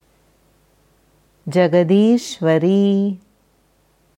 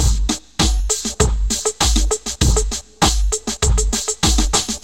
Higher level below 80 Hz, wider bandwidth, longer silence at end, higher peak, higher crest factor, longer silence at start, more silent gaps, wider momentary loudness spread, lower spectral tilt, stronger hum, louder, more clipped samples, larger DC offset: second, -64 dBFS vs -20 dBFS; second, 12 kHz vs 16.5 kHz; first, 1 s vs 0.05 s; about the same, -2 dBFS vs 0 dBFS; about the same, 16 dB vs 16 dB; first, 1.45 s vs 0 s; neither; first, 10 LU vs 4 LU; first, -7 dB/octave vs -3 dB/octave; neither; about the same, -16 LUFS vs -18 LUFS; neither; second, under 0.1% vs 1%